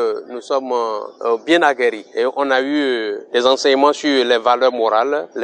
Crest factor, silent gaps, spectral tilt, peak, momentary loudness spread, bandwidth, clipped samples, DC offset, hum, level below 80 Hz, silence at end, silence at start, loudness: 16 dB; none; -2.5 dB/octave; -2 dBFS; 8 LU; 9.8 kHz; under 0.1%; under 0.1%; none; -68 dBFS; 0 s; 0 s; -17 LUFS